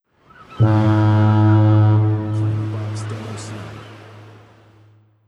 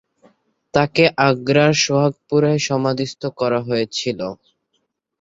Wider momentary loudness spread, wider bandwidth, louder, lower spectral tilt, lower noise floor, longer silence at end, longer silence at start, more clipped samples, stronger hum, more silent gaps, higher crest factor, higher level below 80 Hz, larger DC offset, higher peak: first, 18 LU vs 9 LU; about the same, 8.4 kHz vs 7.8 kHz; about the same, -17 LUFS vs -18 LUFS; first, -8.5 dB/octave vs -5 dB/octave; second, -51 dBFS vs -71 dBFS; first, 1.05 s vs 0.9 s; second, 0.5 s vs 0.75 s; neither; neither; neither; about the same, 14 dB vs 18 dB; about the same, -52 dBFS vs -56 dBFS; neither; second, -4 dBFS vs 0 dBFS